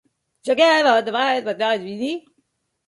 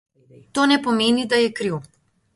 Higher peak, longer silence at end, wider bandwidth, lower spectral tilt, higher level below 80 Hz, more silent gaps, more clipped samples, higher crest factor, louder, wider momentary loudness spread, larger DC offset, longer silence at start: about the same, -2 dBFS vs -4 dBFS; first, 0.7 s vs 0.55 s; about the same, 11.5 kHz vs 11.5 kHz; about the same, -3.5 dB/octave vs -4 dB/octave; second, -72 dBFS vs -62 dBFS; neither; neither; about the same, 18 dB vs 18 dB; about the same, -19 LUFS vs -20 LUFS; first, 13 LU vs 10 LU; neither; about the same, 0.45 s vs 0.55 s